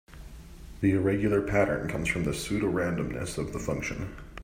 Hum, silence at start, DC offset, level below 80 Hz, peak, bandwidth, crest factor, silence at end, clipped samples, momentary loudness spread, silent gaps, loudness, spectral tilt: none; 0.1 s; under 0.1%; -44 dBFS; -10 dBFS; 16 kHz; 18 dB; 0 s; under 0.1%; 22 LU; none; -29 LUFS; -6 dB/octave